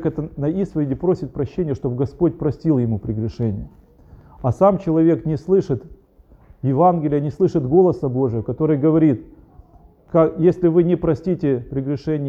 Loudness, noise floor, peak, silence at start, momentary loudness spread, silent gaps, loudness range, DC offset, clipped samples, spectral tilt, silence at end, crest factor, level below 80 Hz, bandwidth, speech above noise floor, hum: -19 LUFS; -50 dBFS; -2 dBFS; 0 s; 9 LU; none; 4 LU; under 0.1%; under 0.1%; -10.5 dB/octave; 0 s; 16 dB; -44 dBFS; 7.2 kHz; 32 dB; none